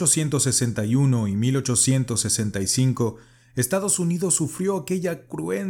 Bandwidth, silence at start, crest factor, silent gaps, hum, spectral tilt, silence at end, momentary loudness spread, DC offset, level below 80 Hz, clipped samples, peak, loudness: 17.5 kHz; 0 s; 18 dB; none; none; -4.5 dB/octave; 0 s; 7 LU; under 0.1%; -56 dBFS; under 0.1%; -6 dBFS; -22 LUFS